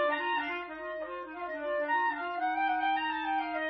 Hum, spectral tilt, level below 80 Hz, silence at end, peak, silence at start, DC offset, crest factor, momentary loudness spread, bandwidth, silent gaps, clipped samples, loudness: none; 1 dB/octave; -68 dBFS; 0 s; -18 dBFS; 0 s; under 0.1%; 14 dB; 9 LU; 5.8 kHz; none; under 0.1%; -32 LUFS